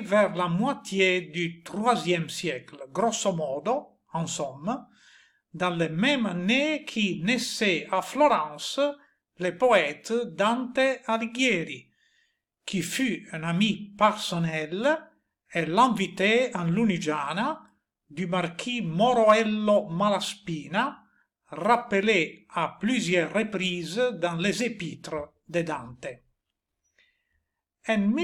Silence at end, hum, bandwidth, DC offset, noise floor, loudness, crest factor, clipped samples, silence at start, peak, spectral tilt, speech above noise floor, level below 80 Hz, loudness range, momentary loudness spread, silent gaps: 0 s; none; 17 kHz; under 0.1%; -83 dBFS; -26 LUFS; 20 dB; under 0.1%; 0 s; -8 dBFS; -4.5 dB/octave; 57 dB; -68 dBFS; 5 LU; 11 LU; none